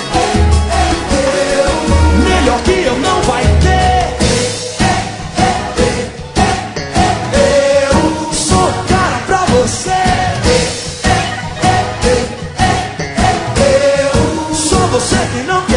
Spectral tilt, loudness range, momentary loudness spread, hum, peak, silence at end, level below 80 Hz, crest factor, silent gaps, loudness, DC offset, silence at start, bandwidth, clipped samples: -4.5 dB/octave; 2 LU; 5 LU; none; 0 dBFS; 0 s; -22 dBFS; 12 dB; none; -12 LUFS; under 0.1%; 0 s; 11 kHz; under 0.1%